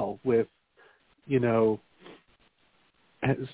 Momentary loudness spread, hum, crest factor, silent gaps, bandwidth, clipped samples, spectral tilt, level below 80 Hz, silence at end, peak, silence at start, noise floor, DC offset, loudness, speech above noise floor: 10 LU; none; 18 dB; none; 4 kHz; under 0.1%; -11.5 dB/octave; -62 dBFS; 0 s; -12 dBFS; 0 s; -68 dBFS; under 0.1%; -28 LUFS; 42 dB